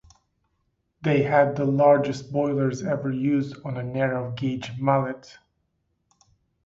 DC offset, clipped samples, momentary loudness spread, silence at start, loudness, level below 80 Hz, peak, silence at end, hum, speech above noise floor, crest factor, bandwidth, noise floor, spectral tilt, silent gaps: under 0.1%; under 0.1%; 11 LU; 1 s; -24 LUFS; -60 dBFS; -6 dBFS; 1.35 s; none; 51 dB; 20 dB; 7.8 kHz; -74 dBFS; -7.5 dB/octave; none